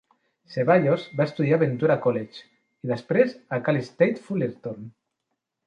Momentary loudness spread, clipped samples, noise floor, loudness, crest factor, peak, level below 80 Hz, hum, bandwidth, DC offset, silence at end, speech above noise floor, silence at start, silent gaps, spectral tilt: 15 LU; under 0.1%; -80 dBFS; -24 LUFS; 20 dB; -6 dBFS; -68 dBFS; none; 7.6 kHz; under 0.1%; 0.75 s; 57 dB; 0.5 s; none; -8.5 dB/octave